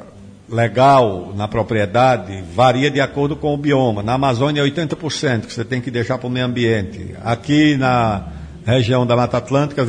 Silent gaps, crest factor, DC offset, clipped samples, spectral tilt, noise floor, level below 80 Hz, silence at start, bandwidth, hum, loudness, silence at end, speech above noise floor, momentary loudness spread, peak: none; 14 dB; under 0.1%; under 0.1%; -6.5 dB/octave; -39 dBFS; -42 dBFS; 0 s; 10 kHz; none; -17 LUFS; 0 s; 23 dB; 9 LU; -2 dBFS